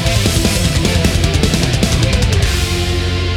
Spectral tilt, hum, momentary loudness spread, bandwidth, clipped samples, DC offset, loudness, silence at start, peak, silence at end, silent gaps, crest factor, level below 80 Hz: -4.5 dB/octave; none; 3 LU; 17 kHz; under 0.1%; under 0.1%; -14 LUFS; 0 s; 0 dBFS; 0 s; none; 12 dB; -20 dBFS